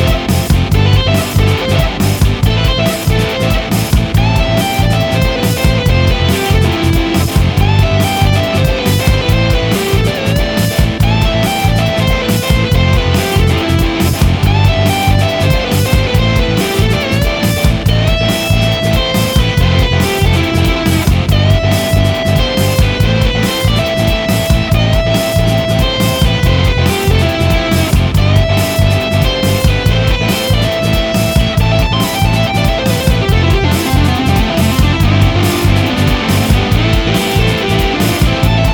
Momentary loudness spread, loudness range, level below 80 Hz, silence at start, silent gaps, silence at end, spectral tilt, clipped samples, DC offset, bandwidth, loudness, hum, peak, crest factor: 2 LU; 1 LU; -18 dBFS; 0 s; none; 0 s; -5.5 dB/octave; under 0.1%; under 0.1%; 19.5 kHz; -12 LUFS; none; 0 dBFS; 10 dB